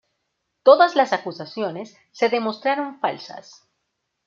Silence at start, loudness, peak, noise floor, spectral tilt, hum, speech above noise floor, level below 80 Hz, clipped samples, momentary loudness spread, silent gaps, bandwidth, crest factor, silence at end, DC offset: 0.65 s; -20 LUFS; -2 dBFS; -76 dBFS; -4.5 dB/octave; none; 56 dB; -76 dBFS; under 0.1%; 21 LU; none; 7.4 kHz; 20 dB; 0.85 s; under 0.1%